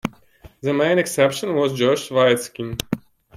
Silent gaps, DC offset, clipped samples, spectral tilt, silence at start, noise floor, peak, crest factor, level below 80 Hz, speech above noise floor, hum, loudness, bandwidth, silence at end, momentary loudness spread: none; under 0.1%; under 0.1%; -4.5 dB/octave; 0.05 s; -48 dBFS; -4 dBFS; 18 dB; -52 dBFS; 29 dB; none; -20 LUFS; 16 kHz; 0.4 s; 11 LU